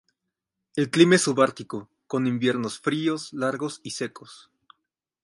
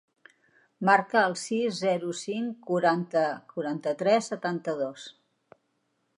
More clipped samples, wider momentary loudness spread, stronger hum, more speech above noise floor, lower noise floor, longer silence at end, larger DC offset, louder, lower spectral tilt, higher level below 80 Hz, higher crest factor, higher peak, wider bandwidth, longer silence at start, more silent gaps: neither; first, 16 LU vs 10 LU; neither; first, 59 dB vs 48 dB; first, -83 dBFS vs -75 dBFS; second, 0.9 s vs 1.05 s; neither; first, -24 LUFS vs -27 LUFS; about the same, -4.5 dB/octave vs -5 dB/octave; first, -72 dBFS vs -84 dBFS; about the same, 22 dB vs 22 dB; first, -4 dBFS vs -8 dBFS; about the same, 11.5 kHz vs 11.5 kHz; about the same, 0.75 s vs 0.8 s; neither